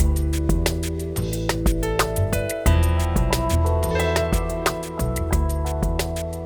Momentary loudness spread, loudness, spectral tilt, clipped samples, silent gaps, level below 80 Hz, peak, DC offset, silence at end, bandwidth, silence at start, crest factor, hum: 5 LU; -23 LUFS; -5.5 dB/octave; under 0.1%; none; -24 dBFS; -6 dBFS; 0.2%; 0 s; over 20 kHz; 0 s; 16 dB; none